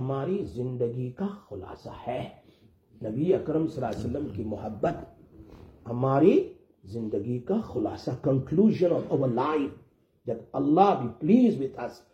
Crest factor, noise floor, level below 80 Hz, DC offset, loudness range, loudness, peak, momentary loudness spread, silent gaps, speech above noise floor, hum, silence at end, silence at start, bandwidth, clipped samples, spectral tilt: 22 dB; -59 dBFS; -58 dBFS; under 0.1%; 6 LU; -27 LUFS; -6 dBFS; 17 LU; none; 32 dB; none; 0.15 s; 0 s; 8.6 kHz; under 0.1%; -9 dB/octave